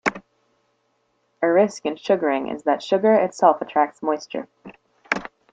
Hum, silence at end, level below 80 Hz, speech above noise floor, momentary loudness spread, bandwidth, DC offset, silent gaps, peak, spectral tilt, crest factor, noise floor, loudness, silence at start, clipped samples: none; 0.25 s; -66 dBFS; 48 dB; 10 LU; 9.2 kHz; under 0.1%; none; -2 dBFS; -5 dB/octave; 20 dB; -68 dBFS; -21 LUFS; 0.05 s; under 0.1%